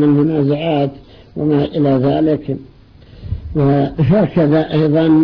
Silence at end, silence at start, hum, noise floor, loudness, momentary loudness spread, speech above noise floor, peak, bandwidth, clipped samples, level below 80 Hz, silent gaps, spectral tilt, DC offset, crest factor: 0 s; 0 s; none; -41 dBFS; -15 LUFS; 13 LU; 27 dB; -4 dBFS; 5.4 kHz; under 0.1%; -38 dBFS; none; -11 dB/octave; under 0.1%; 10 dB